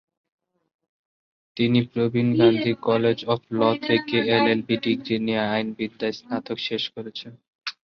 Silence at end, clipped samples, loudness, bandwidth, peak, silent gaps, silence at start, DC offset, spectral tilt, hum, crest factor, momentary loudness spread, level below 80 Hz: 0.2 s; under 0.1%; -23 LUFS; 6.6 kHz; -6 dBFS; 7.48-7.59 s; 1.55 s; under 0.1%; -7.5 dB/octave; none; 18 dB; 15 LU; -62 dBFS